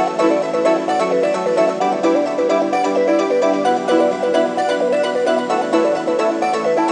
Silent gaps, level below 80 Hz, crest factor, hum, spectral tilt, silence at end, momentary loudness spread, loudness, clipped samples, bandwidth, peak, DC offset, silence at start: none; -70 dBFS; 14 dB; none; -4.5 dB/octave; 0 s; 2 LU; -17 LUFS; under 0.1%; 10 kHz; -2 dBFS; under 0.1%; 0 s